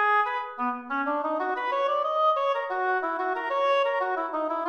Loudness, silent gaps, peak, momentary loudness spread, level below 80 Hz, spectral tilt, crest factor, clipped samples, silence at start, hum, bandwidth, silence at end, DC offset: -26 LUFS; none; -14 dBFS; 5 LU; -78 dBFS; -3 dB/octave; 12 dB; under 0.1%; 0 s; none; 6.6 kHz; 0 s; under 0.1%